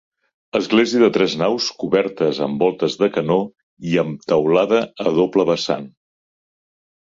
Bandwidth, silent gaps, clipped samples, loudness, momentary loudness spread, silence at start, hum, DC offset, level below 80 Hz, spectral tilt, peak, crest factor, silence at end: 7.6 kHz; 3.63-3.77 s; under 0.1%; -18 LUFS; 7 LU; 0.55 s; none; under 0.1%; -60 dBFS; -5.5 dB/octave; -2 dBFS; 16 dB; 1.15 s